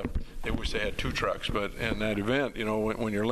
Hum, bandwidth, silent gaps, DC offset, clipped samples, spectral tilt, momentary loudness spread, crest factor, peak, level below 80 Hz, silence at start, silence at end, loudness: none; 13 kHz; none; under 0.1%; under 0.1%; -5.5 dB/octave; 5 LU; 18 dB; -12 dBFS; -38 dBFS; 0 s; 0 s; -31 LUFS